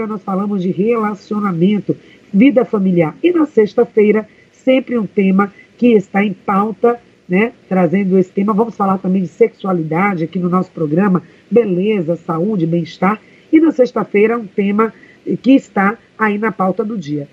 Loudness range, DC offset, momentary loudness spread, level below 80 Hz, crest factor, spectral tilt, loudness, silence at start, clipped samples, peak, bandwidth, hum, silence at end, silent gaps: 2 LU; under 0.1%; 7 LU; -62 dBFS; 14 dB; -9 dB/octave; -15 LUFS; 0 s; under 0.1%; 0 dBFS; 7.6 kHz; none; 0.05 s; none